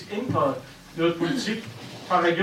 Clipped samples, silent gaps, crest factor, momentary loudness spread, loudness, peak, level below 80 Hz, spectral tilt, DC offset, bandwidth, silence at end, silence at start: under 0.1%; none; 18 dB; 16 LU; -26 LUFS; -8 dBFS; -62 dBFS; -5.5 dB/octave; under 0.1%; 15.5 kHz; 0 s; 0 s